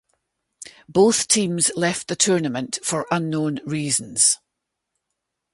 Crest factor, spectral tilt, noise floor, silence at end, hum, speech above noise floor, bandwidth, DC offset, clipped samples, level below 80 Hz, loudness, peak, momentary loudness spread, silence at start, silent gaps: 20 dB; -3 dB/octave; -80 dBFS; 1.2 s; none; 60 dB; 12 kHz; under 0.1%; under 0.1%; -62 dBFS; -20 LUFS; -4 dBFS; 8 LU; 0.6 s; none